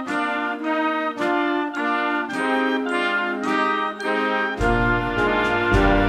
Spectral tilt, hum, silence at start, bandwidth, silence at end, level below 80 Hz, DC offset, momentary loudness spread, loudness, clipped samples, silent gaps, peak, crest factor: -6 dB/octave; none; 0 s; 12.5 kHz; 0 s; -34 dBFS; under 0.1%; 4 LU; -21 LUFS; under 0.1%; none; -6 dBFS; 16 dB